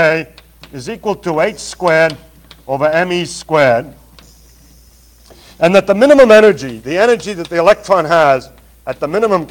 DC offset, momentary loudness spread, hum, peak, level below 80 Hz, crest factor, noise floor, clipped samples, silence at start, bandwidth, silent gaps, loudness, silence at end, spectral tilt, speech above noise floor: under 0.1%; 15 LU; none; 0 dBFS; -46 dBFS; 14 dB; -44 dBFS; 1%; 0 s; 18 kHz; none; -12 LUFS; 0.05 s; -5 dB/octave; 32 dB